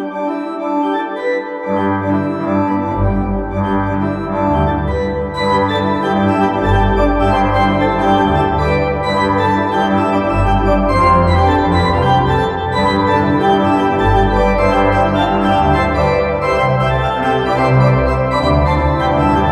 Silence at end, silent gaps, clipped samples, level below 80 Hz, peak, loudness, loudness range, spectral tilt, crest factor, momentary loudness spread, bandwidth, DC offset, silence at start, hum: 0 s; none; under 0.1%; -26 dBFS; 0 dBFS; -14 LUFS; 4 LU; -7.5 dB/octave; 12 dB; 5 LU; 11 kHz; under 0.1%; 0 s; none